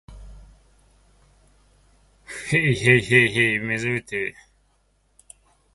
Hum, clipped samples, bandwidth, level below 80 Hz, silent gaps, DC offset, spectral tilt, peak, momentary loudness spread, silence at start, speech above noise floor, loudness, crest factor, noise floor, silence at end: none; under 0.1%; 11.5 kHz; -50 dBFS; none; under 0.1%; -5 dB/octave; -2 dBFS; 15 LU; 0.1 s; 44 dB; -20 LUFS; 22 dB; -65 dBFS; 1.45 s